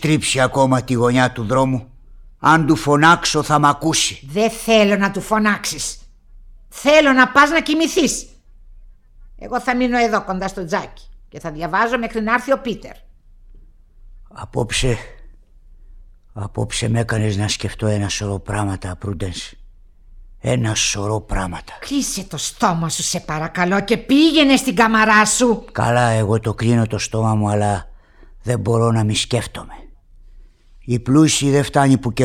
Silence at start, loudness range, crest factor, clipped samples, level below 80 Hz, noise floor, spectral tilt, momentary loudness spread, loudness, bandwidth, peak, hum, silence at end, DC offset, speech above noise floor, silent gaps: 0 s; 8 LU; 18 dB; under 0.1%; -38 dBFS; -44 dBFS; -4.5 dB/octave; 14 LU; -17 LUFS; 17.5 kHz; 0 dBFS; none; 0 s; under 0.1%; 27 dB; none